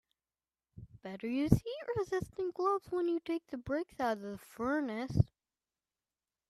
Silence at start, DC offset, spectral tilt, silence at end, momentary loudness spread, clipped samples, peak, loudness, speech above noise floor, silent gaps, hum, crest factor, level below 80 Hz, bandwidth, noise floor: 0.75 s; under 0.1%; -7.5 dB/octave; 1.25 s; 10 LU; under 0.1%; -10 dBFS; -35 LUFS; over 56 dB; none; none; 28 dB; -54 dBFS; 14 kHz; under -90 dBFS